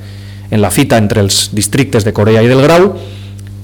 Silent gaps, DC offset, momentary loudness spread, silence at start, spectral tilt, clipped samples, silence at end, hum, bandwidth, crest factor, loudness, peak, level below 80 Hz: none; under 0.1%; 20 LU; 0 s; -5 dB/octave; under 0.1%; 0 s; 50 Hz at -25 dBFS; 19 kHz; 8 dB; -9 LUFS; -2 dBFS; -36 dBFS